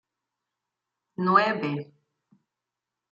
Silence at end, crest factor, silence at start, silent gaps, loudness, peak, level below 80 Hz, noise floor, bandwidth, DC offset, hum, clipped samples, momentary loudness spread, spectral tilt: 1.3 s; 24 dB; 1.2 s; none; -24 LUFS; -6 dBFS; -78 dBFS; -87 dBFS; 7.4 kHz; under 0.1%; none; under 0.1%; 15 LU; -7.5 dB/octave